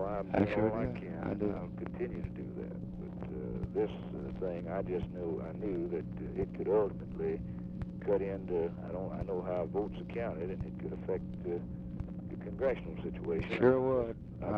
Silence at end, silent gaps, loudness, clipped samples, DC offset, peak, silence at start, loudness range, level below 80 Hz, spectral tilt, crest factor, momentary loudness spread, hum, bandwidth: 0 s; none; -36 LUFS; under 0.1%; under 0.1%; -14 dBFS; 0 s; 4 LU; -52 dBFS; -10 dB/octave; 22 dB; 11 LU; none; 6 kHz